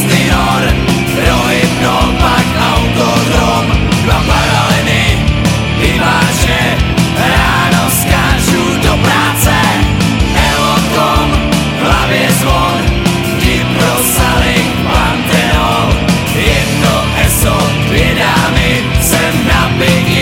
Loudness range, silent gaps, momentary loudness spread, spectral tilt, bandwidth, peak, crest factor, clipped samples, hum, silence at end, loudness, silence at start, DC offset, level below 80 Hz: 1 LU; none; 2 LU; -4.5 dB/octave; 17.5 kHz; 0 dBFS; 10 dB; under 0.1%; none; 0 s; -10 LUFS; 0 s; under 0.1%; -18 dBFS